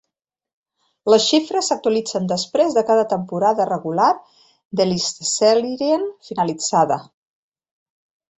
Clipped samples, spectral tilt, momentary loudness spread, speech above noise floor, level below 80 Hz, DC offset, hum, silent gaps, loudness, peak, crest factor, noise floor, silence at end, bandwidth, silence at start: under 0.1%; -4 dB/octave; 7 LU; 63 dB; -64 dBFS; under 0.1%; none; 4.65-4.71 s; -19 LUFS; -2 dBFS; 18 dB; -81 dBFS; 1.35 s; 8.4 kHz; 1.05 s